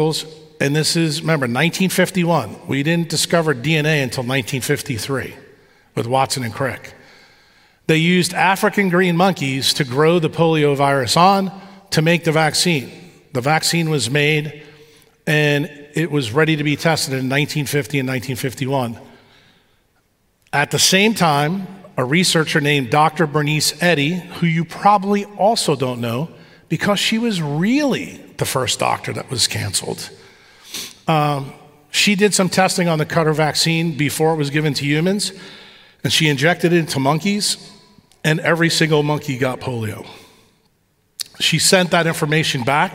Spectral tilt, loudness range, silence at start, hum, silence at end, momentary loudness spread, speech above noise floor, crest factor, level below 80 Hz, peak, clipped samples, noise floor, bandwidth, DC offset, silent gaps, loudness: -4 dB/octave; 5 LU; 0 s; none; 0 s; 11 LU; 45 dB; 18 dB; -58 dBFS; -2 dBFS; under 0.1%; -62 dBFS; 16 kHz; under 0.1%; none; -17 LUFS